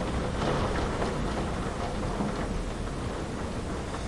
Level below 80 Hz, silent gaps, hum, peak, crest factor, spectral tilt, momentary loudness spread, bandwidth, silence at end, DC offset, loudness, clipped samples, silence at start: -36 dBFS; none; none; -16 dBFS; 16 dB; -6 dB/octave; 5 LU; 11.5 kHz; 0 s; 0.2%; -32 LUFS; under 0.1%; 0 s